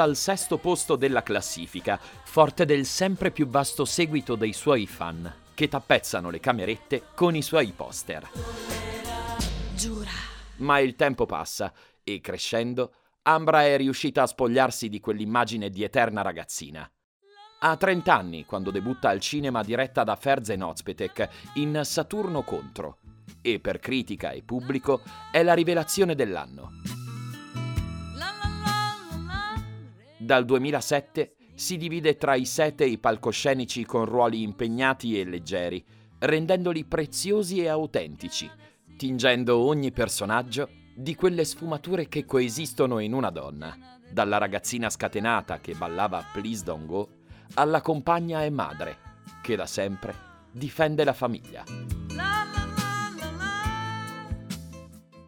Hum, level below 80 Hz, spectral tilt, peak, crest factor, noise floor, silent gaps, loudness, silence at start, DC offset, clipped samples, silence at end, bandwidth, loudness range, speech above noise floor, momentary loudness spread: none; -48 dBFS; -4.5 dB/octave; -2 dBFS; 24 dB; -48 dBFS; 17.04-17.20 s; -27 LUFS; 0 s; under 0.1%; under 0.1%; 0.05 s; over 20 kHz; 5 LU; 22 dB; 13 LU